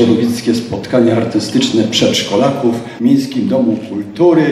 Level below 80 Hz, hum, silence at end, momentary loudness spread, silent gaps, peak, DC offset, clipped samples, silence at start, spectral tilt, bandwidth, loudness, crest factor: -52 dBFS; none; 0 s; 5 LU; none; 0 dBFS; under 0.1%; under 0.1%; 0 s; -5.5 dB/octave; 13.5 kHz; -13 LUFS; 12 dB